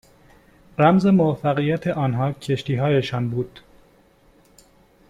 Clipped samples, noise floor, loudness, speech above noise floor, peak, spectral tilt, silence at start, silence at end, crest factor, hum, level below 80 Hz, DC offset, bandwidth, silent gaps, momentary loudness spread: under 0.1%; -55 dBFS; -21 LUFS; 36 dB; -4 dBFS; -8 dB/octave; 0.8 s; 1.6 s; 18 dB; none; -54 dBFS; under 0.1%; 11 kHz; none; 10 LU